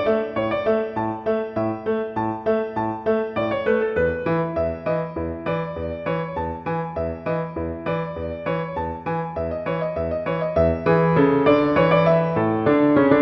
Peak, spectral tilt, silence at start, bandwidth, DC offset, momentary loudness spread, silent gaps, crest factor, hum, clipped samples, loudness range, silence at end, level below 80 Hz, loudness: -4 dBFS; -9.5 dB/octave; 0 s; 5.8 kHz; under 0.1%; 10 LU; none; 18 dB; none; under 0.1%; 8 LU; 0 s; -44 dBFS; -22 LUFS